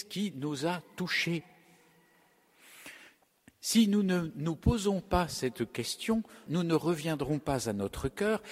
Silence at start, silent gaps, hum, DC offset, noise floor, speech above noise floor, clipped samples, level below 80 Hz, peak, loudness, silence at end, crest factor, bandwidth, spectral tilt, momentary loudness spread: 0 s; none; none; under 0.1%; -66 dBFS; 35 dB; under 0.1%; -48 dBFS; -12 dBFS; -32 LUFS; 0 s; 20 dB; 16 kHz; -5 dB/octave; 9 LU